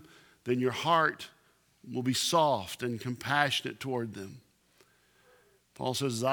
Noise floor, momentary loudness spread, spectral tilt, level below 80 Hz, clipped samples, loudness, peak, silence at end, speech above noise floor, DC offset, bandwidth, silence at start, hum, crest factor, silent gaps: -66 dBFS; 16 LU; -4 dB/octave; -72 dBFS; under 0.1%; -30 LUFS; -10 dBFS; 0 s; 36 dB; under 0.1%; 20 kHz; 0.45 s; 60 Hz at -60 dBFS; 22 dB; none